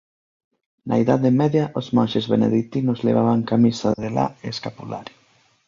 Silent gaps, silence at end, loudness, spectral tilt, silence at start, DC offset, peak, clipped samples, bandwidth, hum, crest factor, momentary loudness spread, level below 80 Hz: none; 0.65 s; -20 LUFS; -7.5 dB/octave; 0.85 s; under 0.1%; -4 dBFS; under 0.1%; 7.2 kHz; none; 16 dB; 13 LU; -56 dBFS